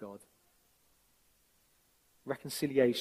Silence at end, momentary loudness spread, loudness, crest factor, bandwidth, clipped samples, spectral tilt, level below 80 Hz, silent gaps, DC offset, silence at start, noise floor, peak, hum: 0 s; 23 LU; -34 LUFS; 22 dB; 15.5 kHz; under 0.1%; -5 dB/octave; -74 dBFS; none; under 0.1%; 0 s; -71 dBFS; -16 dBFS; none